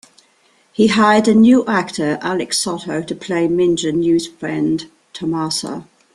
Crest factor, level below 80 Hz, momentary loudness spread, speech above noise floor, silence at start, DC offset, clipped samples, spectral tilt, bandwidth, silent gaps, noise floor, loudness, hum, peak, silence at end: 16 dB; -54 dBFS; 13 LU; 40 dB; 0.8 s; under 0.1%; under 0.1%; -4.5 dB/octave; 12.5 kHz; none; -56 dBFS; -16 LUFS; none; -2 dBFS; 0.3 s